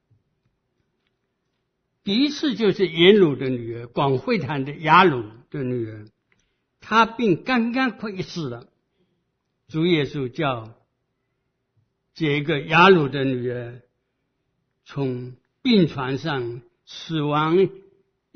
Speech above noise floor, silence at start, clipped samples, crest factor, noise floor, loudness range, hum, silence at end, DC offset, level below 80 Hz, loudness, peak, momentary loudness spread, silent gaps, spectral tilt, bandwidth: 54 dB; 2.05 s; under 0.1%; 22 dB; -75 dBFS; 7 LU; none; 0.6 s; under 0.1%; -58 dBFS; -21 LUFS; 0 dBFS; 18 LU; none; -6.5 dB/octave; 6.6 kHz